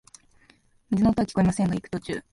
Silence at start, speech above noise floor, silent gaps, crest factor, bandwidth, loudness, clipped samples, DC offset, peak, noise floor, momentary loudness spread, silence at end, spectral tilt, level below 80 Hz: 0.9 s; 36 dB; none; 16 dB; 11.5 kHz; -25 LUFS; under 0.1%; under 0.1%; -10 dBFS; -60 dBFS; 9 LU; 0.15 s; -7 dB/octave; -48 dBFS